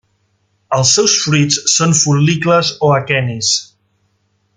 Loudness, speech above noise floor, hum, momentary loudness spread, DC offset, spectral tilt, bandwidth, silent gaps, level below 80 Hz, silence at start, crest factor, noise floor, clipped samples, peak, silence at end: -12 LUFS; 49 dB; none; 5 LU; under 0.1%; -3.5 dB/octave; 10 kHz; none; -54 dBFS; 0.7 s; 14 dB; -62 dBFS; under 0.1%; 0 dBFS; 0.9 s